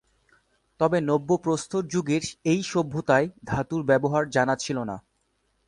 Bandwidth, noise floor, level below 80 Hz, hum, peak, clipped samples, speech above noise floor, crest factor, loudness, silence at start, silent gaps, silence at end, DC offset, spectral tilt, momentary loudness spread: 11.5 kHz; -71 dBFS; -56 dBFS; none; -6 dBFS; under 0.1%; 47 dB; 20 dB; -25 LUFS; 0.8 s; none; 0.7 s; under 0.1%; -5.5 dB/octave; 7 LU